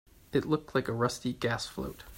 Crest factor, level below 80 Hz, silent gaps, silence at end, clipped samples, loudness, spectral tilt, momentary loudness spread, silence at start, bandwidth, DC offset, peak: 18 dB; -56 dBFS; none; 0 s; under 0.1%; -32 LUFS; -5.5 dB/octave; 5 LU; 0.3 s; 16.5 kHz; under 0.1%; -14 dBFS